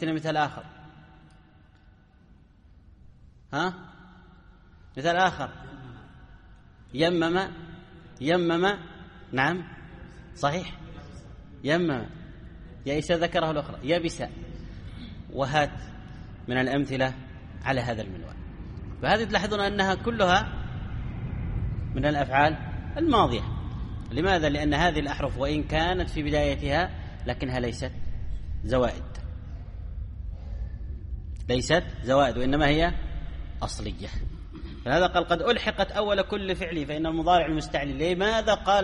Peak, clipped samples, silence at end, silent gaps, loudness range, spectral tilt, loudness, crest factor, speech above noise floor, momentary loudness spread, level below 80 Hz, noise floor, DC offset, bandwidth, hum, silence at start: -8 dBFS; under 0.1%; 0 s; none; 6 LU; -5.5 dB/octave; -27 LUFS; 20 dB; 30 dB; 19 LU; -40 dBFS; -56 dBFS; under 0.1%; 11 kHz; none; 0 s